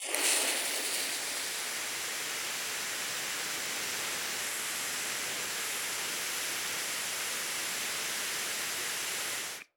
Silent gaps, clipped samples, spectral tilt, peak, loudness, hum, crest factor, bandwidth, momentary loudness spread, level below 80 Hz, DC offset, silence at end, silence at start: none; under 0.1%; 1 dB/octave; -12 dBFS; -32 LUFS; none; 24 dB; over 20 kHz; 3 LU; -76 dBFS; under 0.1%; 0.15 s; 0 s